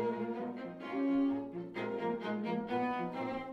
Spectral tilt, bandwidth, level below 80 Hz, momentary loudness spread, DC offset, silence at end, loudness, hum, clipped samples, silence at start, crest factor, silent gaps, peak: -8 dB/octave; 6.2 kHz; -70 dBFS; 8 LU; under 0.1%; 0 s; -37 LUFS; none; under 0.1%; 0 s; 12 dB; none; -24 dBFS